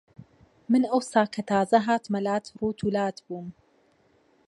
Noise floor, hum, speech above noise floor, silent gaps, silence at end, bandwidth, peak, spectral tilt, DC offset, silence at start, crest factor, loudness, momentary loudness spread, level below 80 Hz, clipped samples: -64 dBFS; none; 39 dB; none; 0.95 s; 11.5 kHz; -6 dBFS; -6 dB/octave; under 0.1%; 0.2 s; 20 dB; -26 LUFS; 16 LU; -64 dBFS; under 0.1%